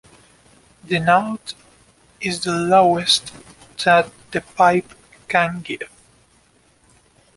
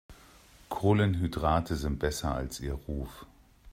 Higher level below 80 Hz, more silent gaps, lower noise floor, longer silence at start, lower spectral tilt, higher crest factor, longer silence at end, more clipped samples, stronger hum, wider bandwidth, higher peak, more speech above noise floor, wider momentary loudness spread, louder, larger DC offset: second, -56 dBFS vs -42 dBFS; neither; about the same, -57 dBFS vs -56 dBFS; first, 0.9 s vs 0.1 s; second, -4 dB/octave vs -6.5 dB/octave; about the same, 20 dB vs 18 dB; first, 1.5 s vs 0 s; neither; neither; second, 11.5 kHz vs 16 kHz; first, -2 dBFS vs -12 dBFS; first, 39 dB vs 27 dB; first, 18 LU vs 13 LU; first, -18 LUFS vs -31 LUFS; neither